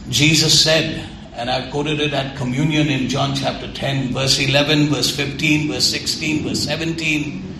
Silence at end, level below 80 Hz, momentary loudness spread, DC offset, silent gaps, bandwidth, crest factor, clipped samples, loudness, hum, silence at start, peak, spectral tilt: 0 s; -42 dBFS; 10 LU; under 0.1%; none; 14 kHz; 18 dB; under 0.1%; -17 LUFS; none; 0 s; 0 dBFS; -3.5 dB/octave